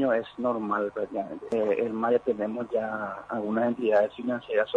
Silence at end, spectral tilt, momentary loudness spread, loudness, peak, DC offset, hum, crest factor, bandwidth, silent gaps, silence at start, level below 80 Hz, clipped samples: 0 s; -7.5 dB/octave; 8 LU; -28 LUFS; -12 dBFS; under 0.1%; none; 16 dB; 9.6 kHz; none; 0 s; -66 dBFS; under 0.1%